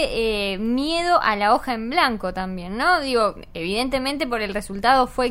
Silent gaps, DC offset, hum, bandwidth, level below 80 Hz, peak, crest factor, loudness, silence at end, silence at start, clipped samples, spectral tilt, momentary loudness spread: none; under 0.1%; none; 16 kHz; -40 dBFS; -4 dBFS; 18 dB; -21 LUFS; 0 s; 0 s; under 0.1%; -4 dB/octave; 9 LU